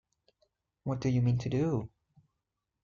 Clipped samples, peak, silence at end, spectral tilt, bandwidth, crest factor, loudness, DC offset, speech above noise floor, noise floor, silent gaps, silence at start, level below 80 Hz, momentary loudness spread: under 0.1%; -18 dBFS; 0.95 s; -8.5 dB/octave; 7.2 kHz; 16 dB; -32 LUFS; under 0.1%; 56 dB; -86 dBFS; none; 0.85 s; -60 dBFS; 12 LU